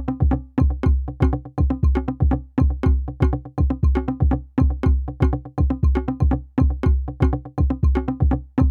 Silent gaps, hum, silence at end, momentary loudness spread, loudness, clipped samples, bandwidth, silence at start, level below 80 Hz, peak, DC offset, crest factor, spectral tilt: none; none; 0 s; 3 LU; -21 LUFS; under 0.1%; 4.3 kHz; 0 s; -22 dBFS; -4 dBFS; under 0.1%; 16 dB; -10.5 dB/octave